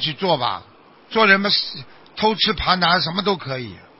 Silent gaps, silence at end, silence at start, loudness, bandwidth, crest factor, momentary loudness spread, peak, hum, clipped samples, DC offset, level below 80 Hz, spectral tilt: none; 0.2 s; 0 s; -18 LUFS; 5.8 kHz; 20 dB; 15 LU; 0 dBFS; none; under 0.1%; under 0.1%; -46 dBFS; -7.5 dB/octave